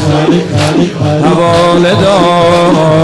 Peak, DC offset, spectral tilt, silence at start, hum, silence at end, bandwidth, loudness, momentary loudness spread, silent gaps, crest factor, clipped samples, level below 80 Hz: -2 dBFS; under 0.1%; -6 dB/octave; 0 s; none; 0 s; 12 kHz; -8 LUFS; 3 LU; none; 6 dB; under 0.1%; -36 dBFS